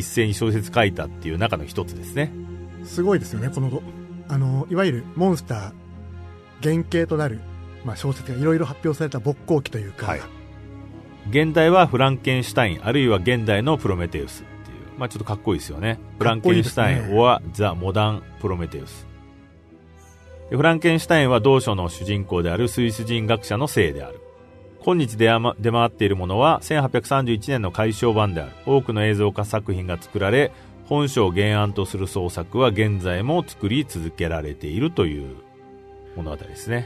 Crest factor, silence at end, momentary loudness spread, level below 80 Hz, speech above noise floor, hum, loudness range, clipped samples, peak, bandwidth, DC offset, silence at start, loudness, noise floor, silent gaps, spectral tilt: 20 dB; 0 s; 17 LU; -44 dBFS; 27 dB; none; 5 LU; under 0.1%; -2 dBFS; 13.5 kHz; under 0.1%; 0 s; -21 LUFS; -48 dBFS; none; -6 dB/octave